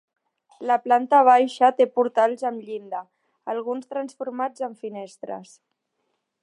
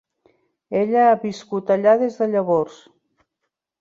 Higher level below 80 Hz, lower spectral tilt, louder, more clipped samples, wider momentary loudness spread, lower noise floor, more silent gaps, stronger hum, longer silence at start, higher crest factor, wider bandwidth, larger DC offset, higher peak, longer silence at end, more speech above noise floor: second, -86 dBFS vs -68 dBFS; second, -4.5 dB/octave vs -7 dB/octave; second, -22 LUFS vs -19 LUFS; neither; first, 19 LU vs 10 LU; about the same, -76 dBFS vs -79 dBFS; neither; neither; about the same, 0.6 s vs 0.7 s; about the same, 20 dB vs 16 dB; first, 11 kHz vs 7.6 kHz; neither; about the same, -4 dBFS vs -4 dBFS; about the same, 1 s vs 1.1 s; second, 54 dB vs 61 dB